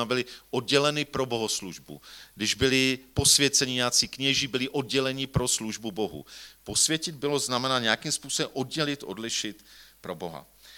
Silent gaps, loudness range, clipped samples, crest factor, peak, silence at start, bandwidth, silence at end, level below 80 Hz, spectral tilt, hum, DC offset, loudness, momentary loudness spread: none; 5 LU; under 0.1%; 24 dB; -4 dBFS; 0 s; 19 kHz; 0 s; -52 dBFS; -2.5 dB/octave; none; under 0.1%; -25 LUFS; 18 LU